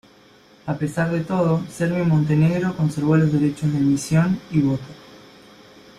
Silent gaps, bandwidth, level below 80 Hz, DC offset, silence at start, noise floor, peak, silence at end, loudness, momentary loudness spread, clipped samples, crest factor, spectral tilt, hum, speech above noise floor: none; 12 kHz; -52 dBFS; under 0.1%; 0.65 s; -51 dBFS; -6 dBFS; 0.8 s; -20 LUFS; 8 LU; under 0.1%; 16 dB; -7.5 dB/octave; none; 31 dB